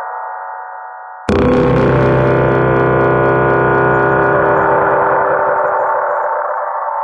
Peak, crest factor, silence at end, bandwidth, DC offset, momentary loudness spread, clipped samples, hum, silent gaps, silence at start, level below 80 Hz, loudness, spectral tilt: 0 dBFS; 12 dB; 0 s; 7.8 kHz; under 0.1%; 13 LU; under 0.1%; none; none; 0 s; -34 dBFS; -12 LUFS; -8.5 dB/octave